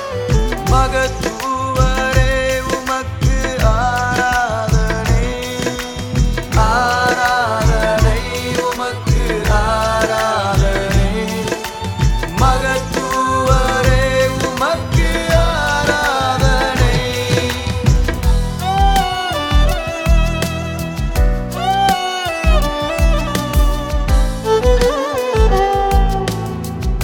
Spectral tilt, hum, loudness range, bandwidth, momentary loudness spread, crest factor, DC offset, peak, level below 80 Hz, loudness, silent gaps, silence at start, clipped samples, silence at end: -5 dB/octave; none; 2 LU; 18 kHz; 6 LU; 14 dB; under 0.1%; 0 dBFS; -18 dBFS; -16 LUFS; none; 0 s; under 0.1%; 0 s